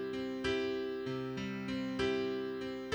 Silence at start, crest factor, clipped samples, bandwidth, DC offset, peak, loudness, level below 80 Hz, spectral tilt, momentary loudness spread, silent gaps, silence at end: 0 s; 16 dB; under 0.1%; over 20 kHz; under 0.1%; -22 dBFS; -37 LUFS; -60 dBFS; -5.5 dB/octave; 5 LU; none; 0 s